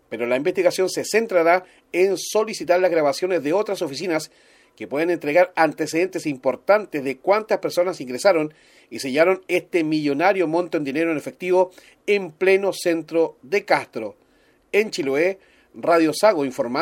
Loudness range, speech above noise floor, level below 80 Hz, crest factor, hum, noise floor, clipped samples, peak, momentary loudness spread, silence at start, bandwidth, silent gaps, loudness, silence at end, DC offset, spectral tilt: 2 LU; 38 dB; -70 dBFS; 20 dB; none; -59 dBFS; under 0.1%; -2 dBFS; 8 LU; 0.1 s; 16.5 kHz; none; -21 LUFS; 0 s; under 0.1%; -4.5 dB/octave